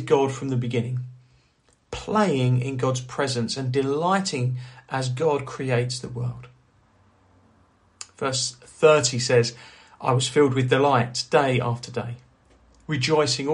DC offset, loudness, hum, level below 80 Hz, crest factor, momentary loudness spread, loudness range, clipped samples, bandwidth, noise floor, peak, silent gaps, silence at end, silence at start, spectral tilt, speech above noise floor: under 0.1%; -23 LUFS; none; -56 dBFS; 20 dB; 13 LU; 8 LU; under 0.1%; 11 kHz; -63 dBFS; -4 dBFS; none; 0 s; 0 s; -5 dB/octave; 40 dB